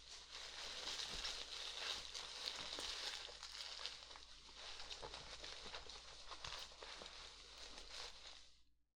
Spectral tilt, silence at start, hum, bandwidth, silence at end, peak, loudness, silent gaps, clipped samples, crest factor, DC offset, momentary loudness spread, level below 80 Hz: 0 dB/octave; 0 s; none; 17.5 kHz; 0.15 s; -26 dBFS; -49 LUFS; none; under 0.1%; 26 dB; under 0.1%; 10 LU; -66 dBFS